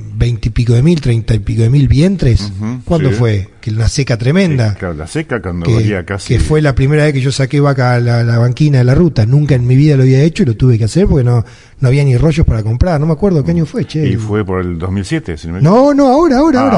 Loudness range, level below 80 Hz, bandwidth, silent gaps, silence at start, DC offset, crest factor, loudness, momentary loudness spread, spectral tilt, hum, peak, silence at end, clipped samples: 4 LU; -26 dBFS; 11 kHz; none; 0 s; under 0.1%; 10 dB; -12 LUFS; 9 LU; -7.5 dB/octave; none; 0 dBFS; 0 s; 0.3%